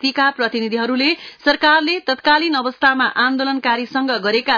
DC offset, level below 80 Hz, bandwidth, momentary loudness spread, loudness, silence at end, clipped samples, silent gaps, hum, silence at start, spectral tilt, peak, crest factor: under 0.1%; -58 dBFS; 5.4 kHz; 5 LU; -16 LUFS; 0 s; under 0.1%; none; none; 0 s; -4 dB/octave; -4 dBFS; 14 dB